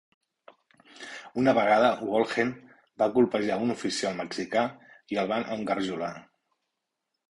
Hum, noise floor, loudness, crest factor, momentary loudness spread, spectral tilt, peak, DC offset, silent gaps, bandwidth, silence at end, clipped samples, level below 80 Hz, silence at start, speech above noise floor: none; -83 dBFS; -27 LUFS; 20 dB; 14 LU; -5 dB/octave; -10 dBFS; under 0.1%; none; 11.5 kHz; 1.1 s; under 0.1%; -66 dBFS; 1 s; 57 dB